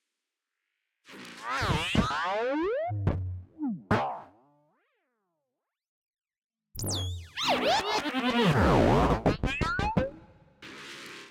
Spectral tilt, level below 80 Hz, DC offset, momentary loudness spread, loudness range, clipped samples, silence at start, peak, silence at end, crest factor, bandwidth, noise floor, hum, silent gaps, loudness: -5.5 dB/octave; -44 dBFS; under 0.1%; 19 LU; 11 LU; under 0.1%; 1.1 s; -12 dBFS; 0 s; 18 dB; 16.5 kHz; -86 dBFS; none; 5.89-6.07 s, 6.44-6.49 s; -28 LUFS